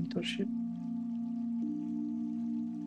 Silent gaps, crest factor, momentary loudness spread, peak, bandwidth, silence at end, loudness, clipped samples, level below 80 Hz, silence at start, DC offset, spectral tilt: none; 16 dB; 3 LU; -20 dBFS; 9.6 kHz; 0 s; -36 LUFS; under 0.1%; -78 dBFS; 0 s; under 0.1%; -6.5 dB/octave